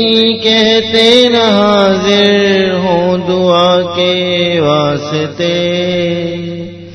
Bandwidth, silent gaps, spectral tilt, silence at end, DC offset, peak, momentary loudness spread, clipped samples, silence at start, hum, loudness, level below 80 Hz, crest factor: 11 kHz; none; -5 dB/octave; 0 s; under 0.1%; 0 dBFS; 8 LU; 0.4%; 0 s; none; -10 LUFS; -48 dBFS; 10 dB